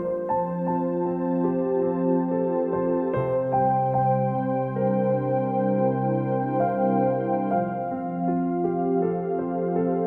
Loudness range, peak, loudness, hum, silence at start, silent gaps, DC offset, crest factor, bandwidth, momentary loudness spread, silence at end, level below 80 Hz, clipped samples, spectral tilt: 1 LU; -12 dBFS; -24 LUFS; none; 0 s; none; under 0.1%; 12 dB; 3.7 kHz; 4 LU; 0 s; -58 dBFS; under 0.1%; -12 dB/octave